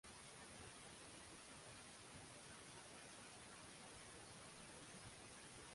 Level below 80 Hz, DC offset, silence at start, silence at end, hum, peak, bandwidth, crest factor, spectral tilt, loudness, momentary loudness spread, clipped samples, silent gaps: -76 dBFS; under 0.1%; 0.05 s; 0 s; none; -44 dBFS; 11.5 kHz; 14 dB; -2.5 dB/octave; -58 LUFS; 1 LU; under 0.1%; none